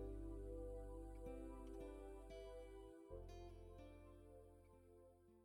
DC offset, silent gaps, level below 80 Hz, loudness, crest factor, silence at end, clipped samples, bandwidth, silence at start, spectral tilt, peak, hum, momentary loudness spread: under 0.1%; none; -60 dBFS; -57 LUFS; 14 dB; 0 s; under 0.1%; 18 kHz; 0 s; -7.5 dB/octave; -42 dBFS; none; 14 LU